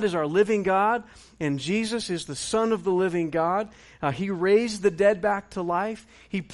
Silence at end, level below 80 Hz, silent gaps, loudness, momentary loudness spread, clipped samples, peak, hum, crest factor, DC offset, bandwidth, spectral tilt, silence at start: 0 s; -58 dBFS; none; -25 LUFS; 9 LU; under 0.1%; -10 dBFS; none; 16 dB; under 0.1%; 11.5 kHz; -5 dB/octave; 0 s